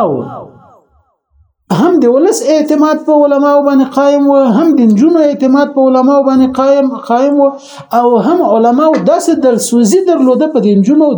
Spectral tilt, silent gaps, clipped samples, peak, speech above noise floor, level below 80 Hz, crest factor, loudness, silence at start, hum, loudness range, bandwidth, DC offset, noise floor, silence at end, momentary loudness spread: -6 dB/octave; none; under 0.1%; 0 dBFS; 46 dB; -56 dBFS; 8 dB; -9 LUFS; 0 s; none; 2 LU; over 20 kHz; under 0.1%; -54 dBFS; 0 s; 4 LU